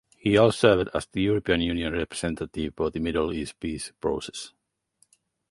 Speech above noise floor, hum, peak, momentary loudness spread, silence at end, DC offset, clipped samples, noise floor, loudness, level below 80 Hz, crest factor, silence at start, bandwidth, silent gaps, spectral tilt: 42 dB; none; -4 dBFS; 13 LU; 1 s; under 0.1%; under 0.1%; -68 dBFS; -25 LUFS; -46 dBFS; 22 dB; 0.25 s; 11.5 kHz; none; -5.5 dB/octave